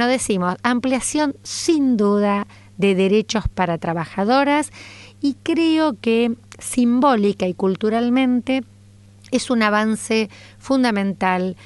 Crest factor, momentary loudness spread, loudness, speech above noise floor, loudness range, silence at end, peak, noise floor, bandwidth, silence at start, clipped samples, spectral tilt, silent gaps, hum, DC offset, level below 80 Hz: 16 dB; 8 LU; -19 LUFS; 28 dB; 2 LU; 0.1 s; -4 dBFS; -46 dBFS; 11.5 kHz; 0 s; under 0.1%; -5 dB/octave; none; none; under 0.1%; -46 dBFS